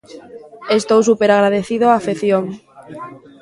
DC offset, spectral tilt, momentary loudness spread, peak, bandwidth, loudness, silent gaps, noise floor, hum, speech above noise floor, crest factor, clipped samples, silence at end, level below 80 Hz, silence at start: under 0.1%; -5 dB/octave; 21 LU; 0 dBFS; 11.5 kHz; -15 LUFS; none; -34 dBFS; none; 18 dB; 16 dB; under 0.1%; 0.25 s; -60 dBFS; 0.1 s